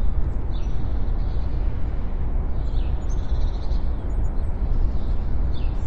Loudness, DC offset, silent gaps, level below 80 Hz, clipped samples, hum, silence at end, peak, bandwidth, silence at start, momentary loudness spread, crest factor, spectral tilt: -28 LUFS; under 0.1%; none; -22 dBFS; under 0.1%; none; 0 s; -8 dBFS; 6.6 kHz; 0 s; 2 LU; 12 dB; -8.5 dB/octave